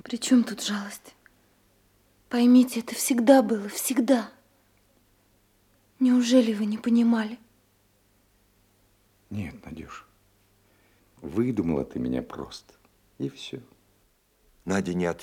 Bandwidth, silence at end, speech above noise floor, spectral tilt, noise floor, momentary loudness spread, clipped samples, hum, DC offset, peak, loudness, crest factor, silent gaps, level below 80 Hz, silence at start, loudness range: 16 kHz; 0 s; 42 dB; -5 dB/octave; -66 dBFS; 22 LU; under 0.1%; none; under 0.1%; -4 dBFS; -24 LUFS; 22 dB; none; -60 dBFS; 0.05 s; 16 LU